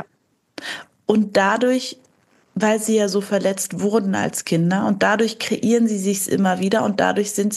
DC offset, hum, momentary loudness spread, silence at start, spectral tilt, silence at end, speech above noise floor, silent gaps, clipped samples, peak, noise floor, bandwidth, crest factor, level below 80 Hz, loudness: under 0.1%; none; 8 LU; 0 s; -4.5 dB/octave; 0 s; 47 dB; none; under 0.1%; -2 dBFS; -65 dBFS; 12.5 kHz; 18 dB; -68 dBFS; -19 LUFS